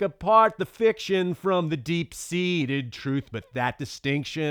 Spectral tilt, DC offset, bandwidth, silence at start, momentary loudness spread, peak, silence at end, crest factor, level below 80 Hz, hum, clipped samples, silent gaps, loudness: -5.5 dB/octave; under 0.1%; over 20 kHz; 0 s; 10 LU; -6 dBFS; 0 s; 20 dB; -58 dBFS; none; under 0.1%; none; -25 LUFS